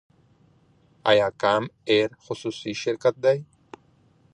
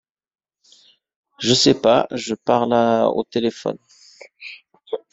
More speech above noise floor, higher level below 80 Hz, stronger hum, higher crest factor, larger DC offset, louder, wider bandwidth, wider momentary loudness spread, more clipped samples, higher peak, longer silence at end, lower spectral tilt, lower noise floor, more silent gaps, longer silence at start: about the same, 37 dB vs 37 dB; second, -64 dBFS vs -58 dBFS; neither; about the same, 20 dB vs 18 dB; neither; second, -24 LUFS vs -18 LUFS; first, 9.8 kHz vs 8.2 kHz; second, 10 LU vs 22 LU; neither; about the same, -4 dBFS vs -2 dBFS; first, 0.9 s vs 0.15 s; about the same, -5 dB/octave vs -4 dB/octave; first, -60 dBFS vs -55 dBFS; neither; second, 1.05 s vs 1.4 s